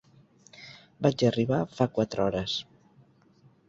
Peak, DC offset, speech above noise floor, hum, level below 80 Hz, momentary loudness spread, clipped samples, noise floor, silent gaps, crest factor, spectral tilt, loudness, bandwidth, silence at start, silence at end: -8 dBFS; under 0.1%; 34 dB; none; -58 dBFS; 22 LU; under 0.1%; -60 dBFS; none; 22 dB; -6.5 dB/octave; -28 LUFS; 7.8 kHz; 0.6 s; 1.05 s